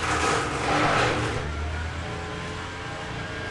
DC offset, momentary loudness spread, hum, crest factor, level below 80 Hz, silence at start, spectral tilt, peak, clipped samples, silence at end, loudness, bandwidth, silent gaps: under 0.1%; 11 LU; none; 16 dB; -40 dBFS; 0 s; -4 dB/octave; -10 dBFS; under 0.1%; 0 s; -27 LUFS; 11.5 kHz; none